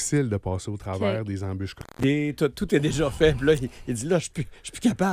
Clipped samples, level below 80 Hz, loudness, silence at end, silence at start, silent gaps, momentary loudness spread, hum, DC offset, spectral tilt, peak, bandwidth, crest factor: under 0.1%; -44 dBFS; -26 LUFS; 0 s; 0 s; none; 11 LU; none; under 0.1%; -5.5 dB/octave; -6 dBFS; 15.5 kHz; 18 dB